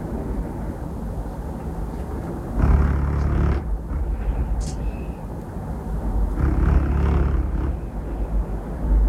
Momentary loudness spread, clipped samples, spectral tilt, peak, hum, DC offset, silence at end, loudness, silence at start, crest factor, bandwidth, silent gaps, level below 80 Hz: 10 LU; under 0.1%; -8.5 dB/octave; -4 dBFS; none; under 0.1%; 0 s; -25 LUFS; 0 s; 18 dB; 9.8 kHz; none; -24 dBFS